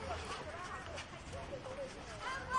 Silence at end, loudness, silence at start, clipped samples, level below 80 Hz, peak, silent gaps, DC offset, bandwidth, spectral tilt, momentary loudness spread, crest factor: 0 s; -45 LUFS; 0 s; under 0.1%; -58 dBFS; -24 dBFS; none; under 0.1%; 11.5 kHz; -4 dB/octave; 4 LU; 18 dB